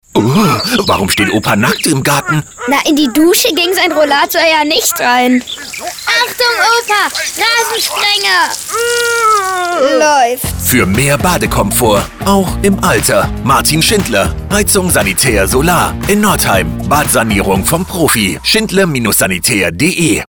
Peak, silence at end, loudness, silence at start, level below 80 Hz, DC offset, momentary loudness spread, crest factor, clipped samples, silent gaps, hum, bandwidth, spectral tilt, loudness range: 0 dBFS; 0.1 s; -10 LUFS; 0.15 s; -30 dBFS; under 0.1%; 4 LU; 12 dB; under 0.1%; none; none; over 20 kHz; -3.5 dB/octave; 1 LU